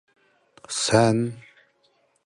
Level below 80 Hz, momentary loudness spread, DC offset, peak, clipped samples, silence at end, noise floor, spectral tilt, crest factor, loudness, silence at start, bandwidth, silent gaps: -58 dBFS; 14 LU; under 0.1%; -6 dBFS; under 0.1%; 0.85 s; -66 dBFS; -4.5 dB/octave; 20 dB; -22 LUFS; 0.7 s; 11.5 kHz; none